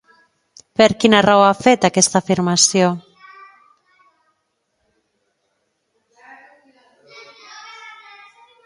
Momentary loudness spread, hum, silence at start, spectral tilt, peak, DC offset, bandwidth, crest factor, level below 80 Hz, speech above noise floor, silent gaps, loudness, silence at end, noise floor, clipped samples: 26 LU; none; 0.8 s; -3.5 dB/octave; 0 dBFS; under 0.1%; 11.5 kHz; 20 dB; -58 dBFS; 57 dB; none; -14 LUFS; 0.75 s; -71 dBFS; under 0.1%